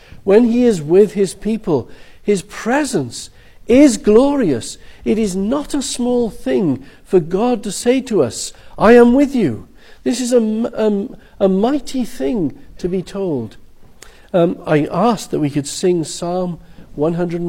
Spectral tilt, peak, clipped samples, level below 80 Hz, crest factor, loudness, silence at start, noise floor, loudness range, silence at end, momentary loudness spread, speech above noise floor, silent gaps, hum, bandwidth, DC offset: -5.5 dB/octave; 0 dBFS; under 0.1%; -40 dBFS; 16 dB; -16 LUFS; 0.1 s; -41 dBFS; 5 LU; 0 s; 13 LU; 25 dB; none; none; 16.5 kHz; under 0.1%